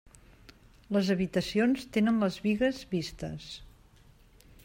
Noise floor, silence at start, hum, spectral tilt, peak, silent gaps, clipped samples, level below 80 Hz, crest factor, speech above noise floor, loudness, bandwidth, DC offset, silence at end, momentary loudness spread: -58 dBFS; 0.9 s; none; -6 dB/octave; -16 dBFS; none; under 0.1%; -56 dBFS; 16 dB; 29 dB; -29 LUFS; 16 kHz; under 0.1%; 1 s; 13 LU